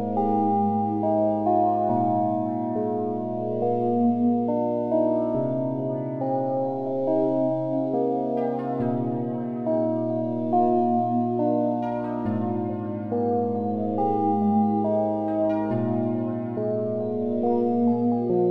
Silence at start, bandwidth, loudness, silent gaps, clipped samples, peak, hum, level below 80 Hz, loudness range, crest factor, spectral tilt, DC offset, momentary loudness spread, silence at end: 0 s; 4.3 kHz; -24 LUFS; none; under 0.1%; -10 dBFS; none; -64 dBFS; 2 LU; 14 dB; -11.5 dB/octave; under 0.1%; 6 LU; 0 s